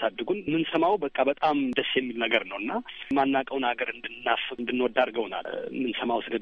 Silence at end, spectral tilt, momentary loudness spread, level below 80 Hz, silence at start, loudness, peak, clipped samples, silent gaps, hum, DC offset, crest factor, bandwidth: 0 s; -6.5 dB/octave; 7 LU; -64 dBFS; 0 s; -27 LUFS; -8 dBFS; under 0.1%; none; none; under 0.1%; 20 dB; 6.4 kHz